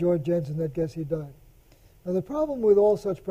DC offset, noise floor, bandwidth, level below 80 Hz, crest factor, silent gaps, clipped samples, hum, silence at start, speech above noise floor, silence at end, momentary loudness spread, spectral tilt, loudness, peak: under 0.1%; -55 dBFS; 14.5 kHz; -52 dBFS; 16 dB; none; under 0.1%; none; 0 s; 31 dB; 0 s; 13 LU; -9 dB/octave; -25 LUFS; -10 dBFS